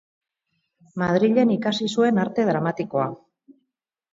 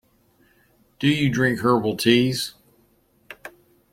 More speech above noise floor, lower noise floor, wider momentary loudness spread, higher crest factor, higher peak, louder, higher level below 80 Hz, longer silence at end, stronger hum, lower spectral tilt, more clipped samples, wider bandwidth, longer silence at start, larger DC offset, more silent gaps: first, 58 dB vs 42 dB; first, -79 dBFS vs -61 dBFS; second, 8 LU vs 22 LU; second, 16 dB vs 22 dB; second, -6 dBFS vs -2 dBFS; about the same, -22 LUFS vs -21 LUFS; second, -64 dBFS vs -56 dBFS; first, 1 s vs 0.45 s; neither; first, -6.5 dB/octave vs -5 dB/octave; neither; second, 7.8 kHz vs 16.5 kHz; about the same, 0.95 s vs 1 s; neither; neither